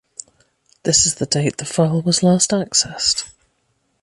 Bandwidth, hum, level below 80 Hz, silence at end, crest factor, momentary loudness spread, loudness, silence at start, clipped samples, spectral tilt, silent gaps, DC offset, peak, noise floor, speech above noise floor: 11.5 kHz; none; -50 dBFS; 0.75 s; 18 dB; 13 LU; -17 LUFS; 0.85 s; under 0.1%; -3.5 dB/octave; none; under 0.1%; -2 dBFS; -67 dBFS; 49 dB